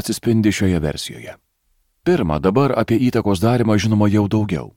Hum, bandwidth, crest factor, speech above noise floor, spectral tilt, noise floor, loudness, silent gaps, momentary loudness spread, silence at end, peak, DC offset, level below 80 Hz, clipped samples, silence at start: none; 16.5 kHz; 14 dB; 48 dB; -6.5 dB/octave; -65 dBFS; -18 LUFS; none; 9 LU; 0.1 s; -4 dBFS; under 0.1%; -40 dBFS; under 0.1%; 0 s